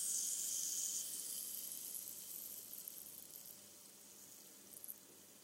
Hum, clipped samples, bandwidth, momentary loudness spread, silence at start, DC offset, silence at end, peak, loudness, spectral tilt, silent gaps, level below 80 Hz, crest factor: none; under 0.1%; 17 kHz; 18 LU; 0 s; under 0.1%; 0 s; -26 dBFS; -43 LUFS; 1 dB/octave; none; under -90 dBFS; 20 dB